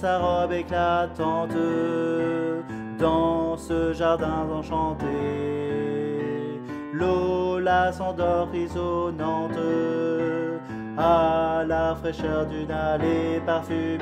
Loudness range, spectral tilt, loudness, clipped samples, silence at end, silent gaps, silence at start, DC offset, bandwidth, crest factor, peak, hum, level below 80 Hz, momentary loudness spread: 2 LU; -7 dB/octave; -25 LUFS; under 0.1%; 0 s; none; 0 s; under 0.1%; 10 kHz; 16 dB; -8 dBFS; none; -44 dBFS; 6 LU